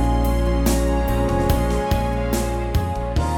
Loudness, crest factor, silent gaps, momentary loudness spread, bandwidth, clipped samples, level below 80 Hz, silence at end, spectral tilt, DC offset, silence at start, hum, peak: -21 LUFS; 14 dB; none; 4 LU; 19.5 kHz; under 0.1%; -22 dBFS; 0 s; -6 dB/octave; under 0.1%; 0 s; none; -6 dBFS